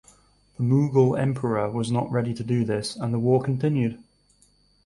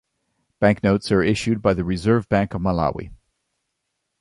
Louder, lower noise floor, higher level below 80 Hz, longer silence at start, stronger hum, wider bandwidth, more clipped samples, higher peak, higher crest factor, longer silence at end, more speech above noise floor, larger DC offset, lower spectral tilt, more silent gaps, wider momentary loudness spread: second, -24 LUFS vs -20 LUFS; second, -61 dBFS vs -77 dBFS; second, -58 dBFS vs -42 dBFS; about the same, 0.6 s vs 0.6 s; first, 50 Hz at -50 dBFS vs none; about the same, 11.5 kHz vs 11.5 kHz; neither; second, -8 dBFS vs -4 dBFS; about the same, 16 dB vs 18 dB; second, 0.85 s vs 1.05 s; second, 38 dB vs 57 dB; neither; about the same, -7.5 dB/octave vs -7 dB/octave; neither; first, 7 LU vs 4 LU